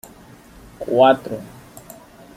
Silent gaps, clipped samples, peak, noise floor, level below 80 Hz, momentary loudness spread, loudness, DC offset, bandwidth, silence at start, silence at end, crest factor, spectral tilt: none; under 0.1%; -2 dBFS; -45 dBFS; -54 dBFS; 26 LU; -16 LUFS; under 0.1%; 16 kHz; 0.8 s; 0.9 s; 20 dB; -5.5 dB/octave